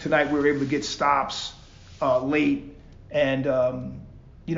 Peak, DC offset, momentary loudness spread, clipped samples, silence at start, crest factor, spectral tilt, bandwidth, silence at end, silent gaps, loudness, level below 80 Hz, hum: -8 dBFS; under 0.1%; 14 LU; under 0.1%; 0 s; 18 dB; -5.5 dB/octave; 7.6 kHz; 0 s; none; -24 LUFS; -50 dBFS; none